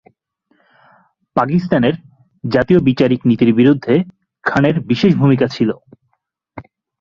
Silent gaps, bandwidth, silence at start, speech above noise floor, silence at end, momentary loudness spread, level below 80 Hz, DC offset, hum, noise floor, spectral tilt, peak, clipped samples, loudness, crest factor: none; 7.2 kHz; 1.35 s; 56 dB; 0.4 s; 10 LU; -48 dBFS; under 0.1%; none; -69 dBFS; -8.5 dB/octave; 0 dBFS; under 0.1%; -15 LUFS; 16 dB